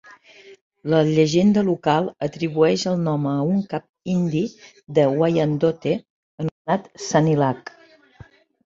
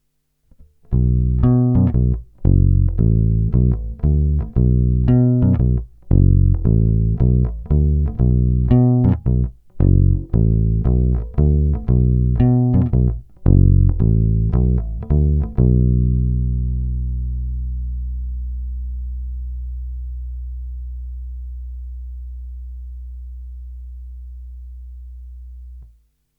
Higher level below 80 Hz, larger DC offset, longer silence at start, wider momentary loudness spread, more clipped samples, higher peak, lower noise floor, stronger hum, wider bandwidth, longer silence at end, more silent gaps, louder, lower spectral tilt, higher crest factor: second, -58 dBFS vs -22 dBFS; neither; second, 0.45 s vs 0.9 s; second, 12 LU vs 20 LU; neither; about the same, -2 dBFS vs 0 dBFS; second, -48 dBFS vs -65 dBFS; neither; first, 7.8 kHz vs 2.8 kHz; first, 1.05 s vs 0.55 s; first, 0.61-0.71 s, 3.89-3.94 s, 6.10-6.38 s, 6.51-6.65 s vs none; second, -21 LUFS vs -18 LUFS; second, -6.5 dB/octave vs -13.5 dB/octave; about the same, 18 dB vs 16 dB